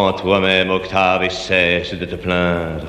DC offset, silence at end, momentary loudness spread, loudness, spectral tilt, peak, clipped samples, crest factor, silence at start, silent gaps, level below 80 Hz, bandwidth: under 0.1%; 0 s; 6 LU; -16 LUFS; -5 dB/octave; -2 dBFS; under 0.1%; 16 dB; 0 s; none; -40 dBFS; 11.5 kHz